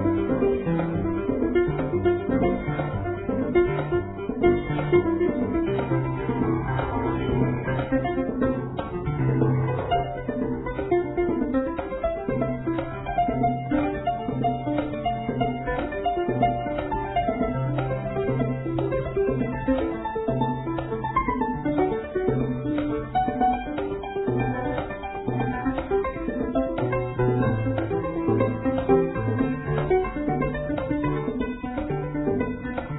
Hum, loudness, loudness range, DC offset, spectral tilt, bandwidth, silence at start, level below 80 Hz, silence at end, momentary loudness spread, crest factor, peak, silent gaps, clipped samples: none; -26 LUFS; 2 LU; under 0.1%; -12 dB/octave; 4 kHz; 0 s; -40 dBFS; 0 s; 6 LU; 18 dB; -8 dBFS; none; under 0.1%